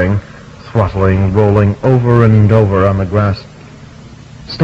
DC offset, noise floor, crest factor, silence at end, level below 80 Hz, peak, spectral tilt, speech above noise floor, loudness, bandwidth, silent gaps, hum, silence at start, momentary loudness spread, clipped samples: under 0.1%; -34 dBFS; 12 dB; 0 s; -34 dBFS; 0 dBFS; -9 dB/octave; 25 dB; -11 LUFS; 7 kHz; none; none; 0 s; 10 LU; 0.9%